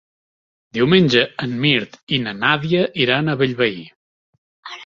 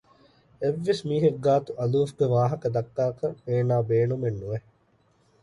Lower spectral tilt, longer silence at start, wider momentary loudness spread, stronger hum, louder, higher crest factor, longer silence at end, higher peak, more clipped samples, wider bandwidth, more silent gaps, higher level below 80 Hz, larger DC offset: second, -6.5 dB/octave vs -8 dB/octave; first, 0.75 s vs 0.6 s; about the same, 8 LU vs 7 LU; neither; first, -17 LUFS vs -26 LUFS; about the same, 18 dB vs 16 dB; second, 0 s vs 0.85 s; first, -2 dBFS vs -10 dBFS; neither; second, 7.4 kHz vs 11.5 kHz; first, 2.03-2.07 s, 3.96-4.63 s vs none; about the same, -56 dBFS vs -60 dBFS; neither